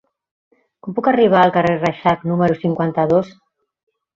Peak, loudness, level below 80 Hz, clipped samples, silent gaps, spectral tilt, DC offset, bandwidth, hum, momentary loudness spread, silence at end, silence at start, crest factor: -2 dBFS; -16 LUFS; -54 dBFS; under 0.1%; none; -8 dB/octave; under 0.1%; 7.4 kHz; none; 9 LU; 0.85 s; 0.85 s; 16 dB